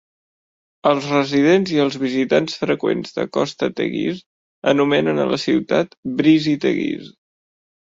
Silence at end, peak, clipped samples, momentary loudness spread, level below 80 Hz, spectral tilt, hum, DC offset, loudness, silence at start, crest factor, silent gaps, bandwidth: 0.85 s; -2 dBFS; under 0.1%; 8 LU; -60 dBFS; -6 dB/octave; none; under 0.1%; -19 LUFS; 0.85 s; 18 dB; 4.26-4.62 s, 5.97-6.03 s; 7.8 kHz